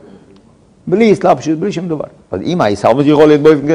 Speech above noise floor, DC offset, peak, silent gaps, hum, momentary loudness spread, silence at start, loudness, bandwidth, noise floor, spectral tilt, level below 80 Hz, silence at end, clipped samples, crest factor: 35 dB; under 0.1%; 0 dBFS; none; none; 14 LU; 0.85 s; -12 LUFS; 10.5 kHz; -45 dBFS; -7 dB/octave; -48 dBFS; 0 s; 1%; 12 dB